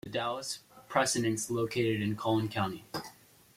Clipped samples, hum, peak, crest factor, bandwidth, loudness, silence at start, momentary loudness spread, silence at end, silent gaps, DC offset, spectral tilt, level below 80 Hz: under 0.1%; none; -12 dBFS; 20 dB; 16.5 kHz; -32 LUFS; 0.05 s; 13 LU; 0.45 s; none; under 0.1%; -4.5 dB/octave; -66 dBFS